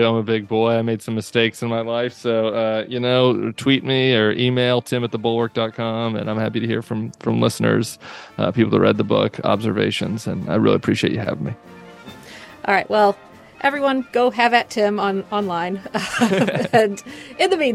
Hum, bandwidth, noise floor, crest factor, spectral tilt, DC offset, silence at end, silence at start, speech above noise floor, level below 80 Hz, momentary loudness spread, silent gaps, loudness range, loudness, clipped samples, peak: none; 13 kHz; -40 dBFS; 18 dB; -5.5 dB/octave; under 0.1%; 0 s; 0 s; 21 dB; -60 dBFS; 9 LU; none; 3 LU; -19 LUFS; under 0.1%; -2 dBFS